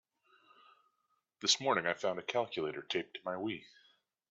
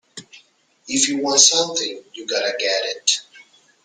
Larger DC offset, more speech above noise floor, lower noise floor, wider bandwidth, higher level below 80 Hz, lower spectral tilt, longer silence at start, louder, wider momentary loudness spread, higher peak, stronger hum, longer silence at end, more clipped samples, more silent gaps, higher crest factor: neither; first, 45 dB vs 36 dB; first, -81 dBFS vs -55 dBFS; second, 8 kHz vs 13 kHz; second, -82 dBFS vs -70 dBFS; about the same, -1 dB/octave vs 0 dB/octave; first, 1.4 s vs 0.15 s; second, -35 LUFS vs -17 LUFS; second, 11 LU vs 17 LU; second, -16 dBFS vs 0 dBFS; neither; first, 0.65 s vs 0.45 s; neither; neither; about the same, 22 dB vs 22 dB